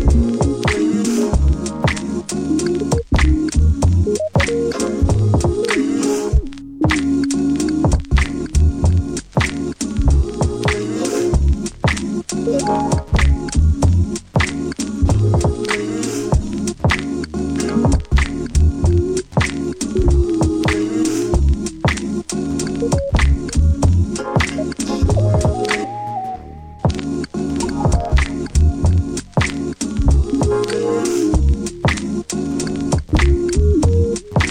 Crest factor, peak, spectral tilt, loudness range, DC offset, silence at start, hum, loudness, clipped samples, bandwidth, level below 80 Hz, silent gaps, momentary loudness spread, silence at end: 14 dB; -2 dBFS; -6 dB/octave; 2 LU; under 0.1%; 0 s; none; -18 LUFS; under 0.1%; 10 kHz; -20 dBFS; none; 6 LU; 0 s